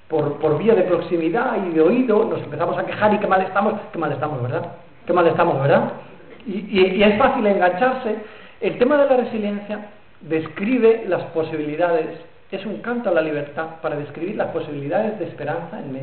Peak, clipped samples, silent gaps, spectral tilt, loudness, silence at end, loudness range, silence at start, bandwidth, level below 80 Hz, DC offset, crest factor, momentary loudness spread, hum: -6 dBFS; under 0.1%; none; -11 dB/octave; -20 LUFS; 0 s; 6 LU; 0.1 s; 4.5 kHz; -54 dBFS; 0.5%; 14 dB; 13 LU; none